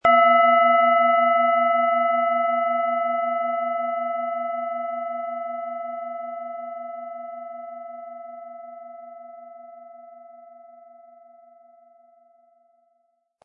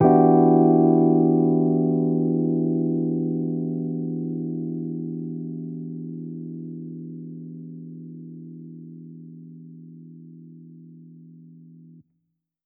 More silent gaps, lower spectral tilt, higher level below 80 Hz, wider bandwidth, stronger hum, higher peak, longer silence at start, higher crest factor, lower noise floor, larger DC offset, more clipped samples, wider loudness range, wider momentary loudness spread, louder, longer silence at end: neither; second, -5.5 dB/octave vs -14 dB/octave; about the same, -72 dBFS vs -70 dBFS; first, 3.9 kHz vs 2.5 kHz; neither; about the same, -6 dBFS vs -4 dBFS; about the same, 0.05 s vs 0 s; about the same, 18 dB vs 20 dB; second, -70 dBFS vs -76 dBFS; neither; neither; about the same, 23 LU vs 24 LU; about the same, 24 LU vs 26 LU; about the same, -21 LUFS vs -22 LUFS; first, 2.85 s vs 1.05 s